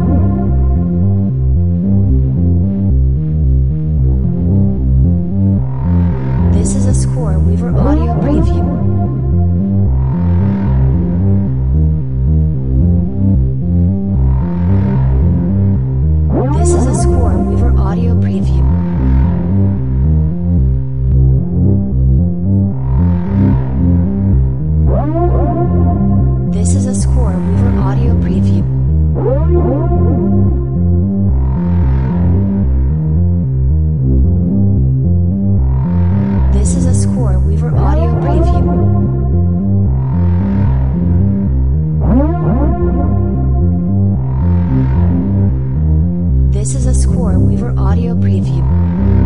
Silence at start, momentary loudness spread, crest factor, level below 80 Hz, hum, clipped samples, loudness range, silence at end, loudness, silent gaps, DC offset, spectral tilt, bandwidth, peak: 0 s; 2 LU; 12 dB; -16 dBFS; none; under 0.1%; 1 LU; 0 s; -13 LUFS; none; 6%; -9 dB/octave; 11 kHz; 0 dBFS